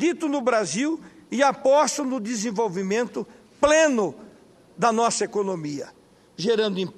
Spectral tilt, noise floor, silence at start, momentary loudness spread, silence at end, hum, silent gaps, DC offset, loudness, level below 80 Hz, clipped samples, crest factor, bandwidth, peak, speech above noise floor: -4 dB/octave; -52 dBFS; 0 s; 13 LU; 0.05 s; none; none; under 0.1%; -23 LUFS; -60 dBFS; under 0.1%; 18 dB; 13 kHz; -6 dBFS; 29 dB